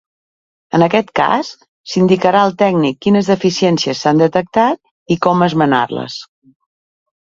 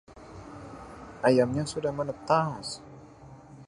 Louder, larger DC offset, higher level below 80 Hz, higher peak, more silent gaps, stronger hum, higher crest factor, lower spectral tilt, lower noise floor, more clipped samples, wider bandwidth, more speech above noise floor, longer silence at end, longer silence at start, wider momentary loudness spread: first, -14 LUFS vs -28 LUFS; neither; about the same, -54 dBFS vs -58 dBFS; first, 0 dBFS vs -10 dBFS; first, 1.68-1.84 s, 4.91-5.06 s vs none; neither; second, 14 dB vs 20 dB; about the same, -6 dB/octave vs -6 dB/octave; first, under -90 dBFS vs -49 dBFS; neither; second, 7.6 kHz vs 11.5 kHz; first, over 77 dB vs 23 dB; first, 1.05 s vs 0 s; first, 0.75 s vs 0.1 s; second, 9 LU vs 25 LU